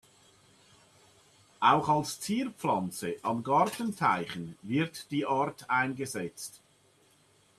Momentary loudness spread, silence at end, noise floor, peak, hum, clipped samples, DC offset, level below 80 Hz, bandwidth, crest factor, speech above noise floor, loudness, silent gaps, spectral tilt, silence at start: 11 LU; 1.05 s; -65 dBFS; -8 dBFS; none; under 0.1%; under 0.1%; -72 dBFS; 14 kHz; 22 dB; 35 dB; -30 LUFS; none; -5 dB/octave; 1.6 s